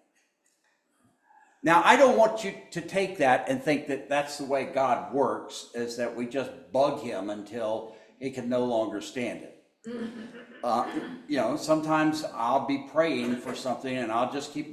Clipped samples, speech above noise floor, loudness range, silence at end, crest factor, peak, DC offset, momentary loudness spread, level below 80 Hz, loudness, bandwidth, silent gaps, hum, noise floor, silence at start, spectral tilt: under 0.1%; 44 dB; 8 LU; 0 s; 24 dB; -4 dBFS; under 0.1%; 14 LU; -72 dBFS; -27 LUFS; 14 kHz; none; none; -71 dBFS; 1.65 s; -4.5 dB/octave